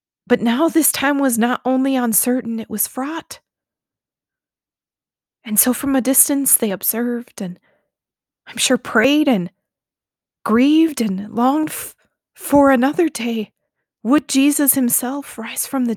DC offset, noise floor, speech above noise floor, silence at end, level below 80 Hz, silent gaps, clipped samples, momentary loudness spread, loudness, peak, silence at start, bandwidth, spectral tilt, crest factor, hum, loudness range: under 0.1%; under -90 dBFS; over 73 dB; 0 s; -58 dBFS; none; under 0.1%; 16 LU; -17 LUFS; 0 dBFS; 0.3 s; over 20 kHz; -3 dB/octave; 18 dB; none; 5 LU